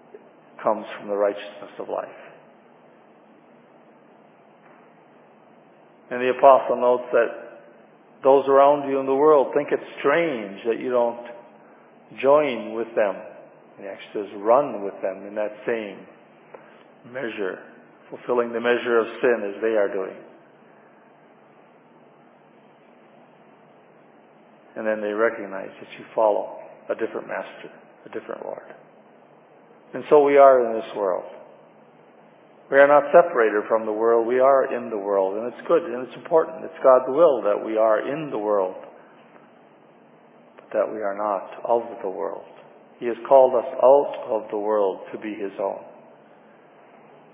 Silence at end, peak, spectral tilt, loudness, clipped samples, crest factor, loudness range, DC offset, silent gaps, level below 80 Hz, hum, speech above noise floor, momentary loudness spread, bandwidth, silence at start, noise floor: 1.45 s; -2 dBFS; -9 dB/octave; -21 LUFS; under 0.1%; 22 dB; 11 LU; under 0.1%; none; -86 dBFS; none; 32 dB; 20 LU; 3.8 kHz; 0.15 s; -53 dBFS